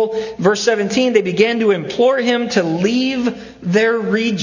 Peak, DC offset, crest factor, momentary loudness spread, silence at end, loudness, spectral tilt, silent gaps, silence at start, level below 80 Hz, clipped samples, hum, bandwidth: 0 dBFS; under 0.1%; 16 dB; 4 LU; 0 s; -16 LUFS; -5 dB/octave; none; 0 s; -56 dBFS; under 0.1%; none; 7.4 kHz